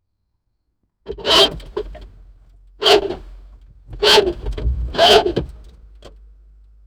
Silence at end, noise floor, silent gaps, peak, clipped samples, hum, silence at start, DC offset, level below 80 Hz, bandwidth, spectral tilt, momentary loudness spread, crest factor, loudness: 0.8 s; -70 dBFS; none; 0 dBFS; under 0.1%; none; 1.05 s; under 0.1%; -32 dBFS; 19 kHz; -3 dB/octave; 20 LU; 20 dB; -15 LUFS